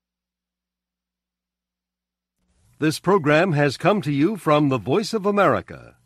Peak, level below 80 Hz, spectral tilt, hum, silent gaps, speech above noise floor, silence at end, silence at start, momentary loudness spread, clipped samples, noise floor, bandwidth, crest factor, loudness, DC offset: -4 dBFS; -60 dBFS; -6.5 dB/octave; 60 Hz at -55 dBFS; none; 67 dB; 0.25 s; 2.8 s; 5 LU; under 0.1%; -87 dBFS; 14.5 kHz; 18 dB; -20 LUFS; under 0.1%